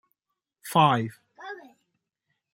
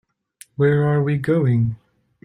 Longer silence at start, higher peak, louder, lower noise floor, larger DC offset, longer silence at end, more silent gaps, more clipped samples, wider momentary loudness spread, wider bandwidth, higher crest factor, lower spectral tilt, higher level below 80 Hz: about the same, 0.65 s vs 0.6 s; about the same, -6 dBFS vs -6 dBFS; second, -23 LUFS vs -19 LUFS; first, -85 dBFS vs -50 dBFS; neither; first, 0.95 s vs 0.5 s; neither; neither; first, 23 LU vs 14 LU; first, 16 kHz vs 11.5 kHz; first, 22 dB vs 14 dB; second, -5.5 dB/octave vs -9 dB/octave; second, -72 dBFS vs -54 dBFS